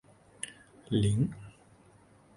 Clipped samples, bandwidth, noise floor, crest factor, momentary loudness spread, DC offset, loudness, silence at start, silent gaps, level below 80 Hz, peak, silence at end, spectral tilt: under 0.1%; 11.5 kHz; -60 dBFS; 20 dB; 20 LU; under 0.1%; -32 LUFS; 0.45 s; none; -54 dBFS; -16 dBFS; 0.85 s; -6.5 dB/octave